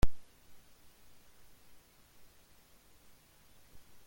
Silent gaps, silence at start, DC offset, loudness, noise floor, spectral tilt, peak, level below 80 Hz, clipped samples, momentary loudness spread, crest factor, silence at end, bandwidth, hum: none; 0 s; under 0.1%; -55 LUFS; -63 dBFS; -5.5 dB/octave; -14 dBFS; -46 dBFS; under 0.1%; 1 LU; 22 dB; 0 s; 17 kHz; none